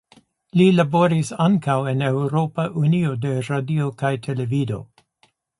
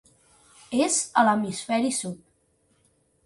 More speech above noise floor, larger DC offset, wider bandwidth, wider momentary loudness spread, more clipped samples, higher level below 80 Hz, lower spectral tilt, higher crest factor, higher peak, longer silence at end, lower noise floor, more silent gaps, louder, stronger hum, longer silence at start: about the same, 43 dB vs 43 dB; neither; about the same, 11.5 kHz vs 11.5 kHz; second, 8 LU vs 11 LU; neither; first, -58 dBFS vs -68 dBFS; first, -7.5 dB/octave vs -3 dB/octave; second, 16 dB vs 22 dB; about the same, -4 dBFS vs -6 dBFS; second, 0.75 s vs 1.1 s; second, -63 dBFS vs -67 dBFS; neither; first, -20 LUFS vs -24 LUFS; neither; second, 0.55 s vs 0.7 s